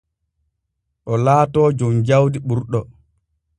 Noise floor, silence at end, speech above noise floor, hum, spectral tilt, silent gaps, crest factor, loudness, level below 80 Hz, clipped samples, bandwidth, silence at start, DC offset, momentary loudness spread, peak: -75 dBFS; 0.75 s; 59 dB; none; -8 dB/octave; none; 18 dB; -17 LUFS; -50 dBFS; under 0.1%; 10 kHz; 1.05 s; under 0.1%; 10 LU; -2 dBFS